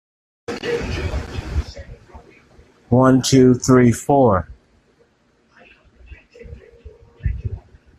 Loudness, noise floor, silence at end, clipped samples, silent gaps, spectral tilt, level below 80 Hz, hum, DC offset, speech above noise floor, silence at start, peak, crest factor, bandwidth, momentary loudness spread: -17 LUFS; -59 dBFS; 0.4 s; under 0.1%; none; -6 dB/octave; -36 dBFS; none; under 0.1%; 45 dB; 0.5 s; -2 dBFS; 18 dB; 13 kHz; 21 LU